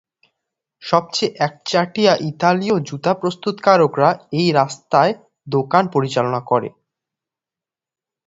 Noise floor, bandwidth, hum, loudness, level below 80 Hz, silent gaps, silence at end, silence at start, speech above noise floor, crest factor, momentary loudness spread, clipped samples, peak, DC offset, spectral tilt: -89 dBFS; 8 kHz; none; -18 LUFS; -62 dBFS; none; 1.55 s; 0.85 s; 72 dB; 18 dB; 7 LU; under 0.1%; 0 dBFS; under 0.1%; -5.5 dB/octave